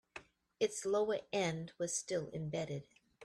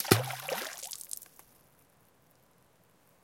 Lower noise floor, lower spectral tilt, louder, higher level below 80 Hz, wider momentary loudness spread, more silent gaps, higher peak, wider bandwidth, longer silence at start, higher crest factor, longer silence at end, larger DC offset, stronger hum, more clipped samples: second, -57 dBFS vs -66 dBFS; about the same, -4 dB/octave vs -4 dB/octave; second, -38 LUFS vs -34 LUFS; about the same, -74 dBFS vs -72 dBFS; second, 10 LU vs 23 LU; neither; second, -22 dBFS vs -4 dBFS; second, 13.5 kHz vs 17 kHz; first, 0.15 s vs 0 s; second, 18 dB vs 34 dB; second, 0 s vs 2 s; neither; neither; neither